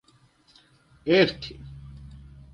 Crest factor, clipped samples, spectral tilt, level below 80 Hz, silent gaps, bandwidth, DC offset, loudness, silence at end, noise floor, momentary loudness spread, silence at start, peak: 22 dB; under 0.1%; -6.5 dB/octave; -50 dBFS; none; 9.6 kHz; under 0.1%; -23 LUFS; 0.35 s; -60 dBFS; 26 LU; 1.05 s; -6 dBFS